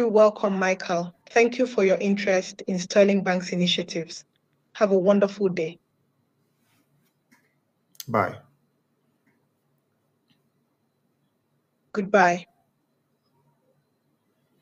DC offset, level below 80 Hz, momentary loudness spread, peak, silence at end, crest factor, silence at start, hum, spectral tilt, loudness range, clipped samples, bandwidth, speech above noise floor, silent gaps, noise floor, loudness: under 0.1%; -74 dBFS; 12 LU; -6 dBFS; 2.2 s; 20 dB; 0 s; none; -5 dB/octave; 11 LU; under 0.1%; 15.5 kHz; 50 dB; none; -72 dBFS; -23 LUFS